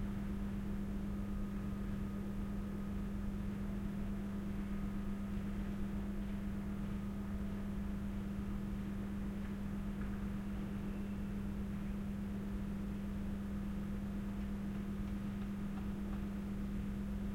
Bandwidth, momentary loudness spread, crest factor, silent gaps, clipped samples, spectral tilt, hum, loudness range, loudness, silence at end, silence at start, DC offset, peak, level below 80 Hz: 16 kHz; 1 LU; 12 dB; none; under 0.1%; -8 dB/octave; none; 0 LU; -42 LUFS; 0 s; 0 s; under 0.1%; -28 dBFS; -46 dBFS